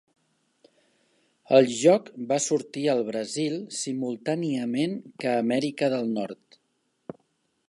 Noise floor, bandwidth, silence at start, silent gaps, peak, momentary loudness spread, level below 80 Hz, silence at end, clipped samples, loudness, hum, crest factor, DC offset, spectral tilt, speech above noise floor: -73 dBFS; 11.5 kHz; 1.5 s; none; -4 dBFS; 14 LU; -78 dBFS; 0.6 s; under 0.1%; -26 LUFS; none; 22 dB; under 0.1%; -4.5 dB/octave; 48 dB